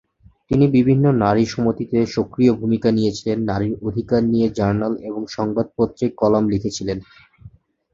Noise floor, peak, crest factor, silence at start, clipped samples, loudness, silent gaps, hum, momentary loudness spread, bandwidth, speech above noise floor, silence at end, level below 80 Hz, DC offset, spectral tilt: -46 dBFS; -2 dBFS; 18 dB; 0.5 s; under 0.1%; -19 LUFS; none; none; 9 LU; 7.6 kHz; 28 dB; 0.45 s; -46 dBFS; under 0.1%; -7.5 dB/octave